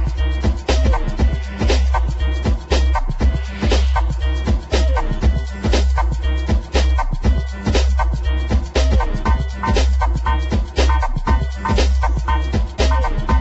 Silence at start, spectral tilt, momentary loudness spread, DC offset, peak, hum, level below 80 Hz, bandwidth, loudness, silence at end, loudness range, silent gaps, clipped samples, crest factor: 0 s; -6 dB/octave; 4 LU; under 0.1%; -2 dBFS; none; -18 dBFS; 8 kHz; -19 LUFS; 0 s; 0 LU; none; under 0.1%; 14 dB